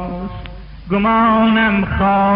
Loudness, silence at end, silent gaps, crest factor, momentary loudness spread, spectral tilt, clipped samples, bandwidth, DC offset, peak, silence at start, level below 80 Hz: -14 LUFS; 0 s; none; 12 dB; 20 LU; -4.5 dB/octave; under 0.1%; 5.2 kHz; under 0.1%; -4 dBFS; 0 s; -32 dBFS